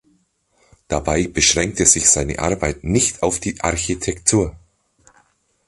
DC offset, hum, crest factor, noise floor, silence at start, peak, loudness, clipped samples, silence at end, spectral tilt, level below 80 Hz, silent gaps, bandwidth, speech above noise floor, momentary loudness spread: under 0.1%; none; 20 dB; -62 dBFS; 0.9 s; 0 dBFS; -17 LUFS; under 0.1%; 1.1 s; -3 dB/octave; -36 dBFS; none; 11.5 kHz; 44 dB; 10 LU